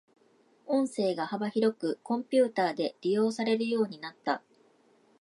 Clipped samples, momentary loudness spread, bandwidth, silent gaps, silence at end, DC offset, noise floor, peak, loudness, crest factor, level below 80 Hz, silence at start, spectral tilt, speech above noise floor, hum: under 0.1%; 7 LU; 11.5 kHz; none; 0.85 s; under 0.1%; -65 dBFS; -14 dBFS; -30 LUFS; 18 dB; -84 dBFS; 0.7 s; -5.5 dB/octave; 36 dB; none